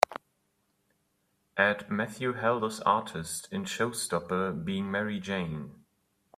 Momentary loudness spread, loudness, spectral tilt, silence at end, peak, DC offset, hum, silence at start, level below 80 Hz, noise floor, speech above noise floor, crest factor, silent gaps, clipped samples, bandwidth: 10 LU; -31 LUFS; -4.5 dB/octave; 0.6 s; -2 dBFS; under 0.1%; none; 0.1 s; -66 dBFS; -75 dBFS; 44 dB; 30 dB; none; under 0.1%; 15.5 kHz